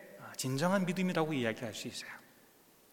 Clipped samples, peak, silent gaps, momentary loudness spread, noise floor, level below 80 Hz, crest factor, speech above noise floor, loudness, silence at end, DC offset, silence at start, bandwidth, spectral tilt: under 0.1%; -16 dBFS; none; 14 LU; -63 dBFS; -80 dBFS; 20 dB; 29 dB; -35 LUFS; 0.65 s; under 0.1%; 0 s; 18.5 kHz; -5 dB/octave